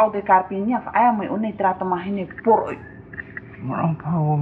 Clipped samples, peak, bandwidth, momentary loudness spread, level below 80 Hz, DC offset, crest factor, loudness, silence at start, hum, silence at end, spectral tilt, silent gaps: under 0.1%; -2 dBFS; 4.2 kHz; 16 LU; -54 dBFS; under 0.1%; 18 dB; -21 LUFS; 0 s; none; 0 s; -10.5 dB/octave; none